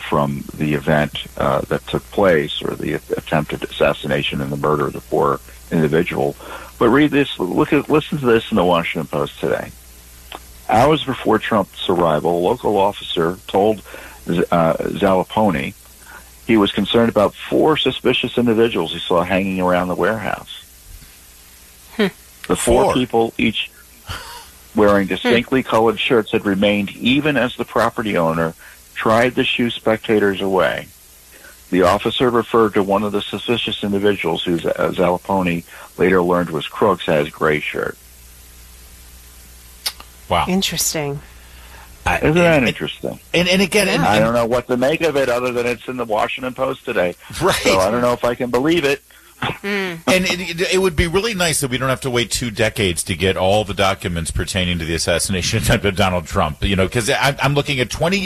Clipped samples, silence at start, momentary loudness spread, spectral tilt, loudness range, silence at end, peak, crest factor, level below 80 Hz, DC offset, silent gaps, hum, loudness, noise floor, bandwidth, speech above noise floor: under 0.1%; 0 s; 9 LU; -4.5 dB/octave; 3 LU; 0 s; -2 dBFS; 16 dB; -38 dBFS; under 0.1%; none; none; -18 LUFS; -44 dBFS; 13.5 kHz; 26 dB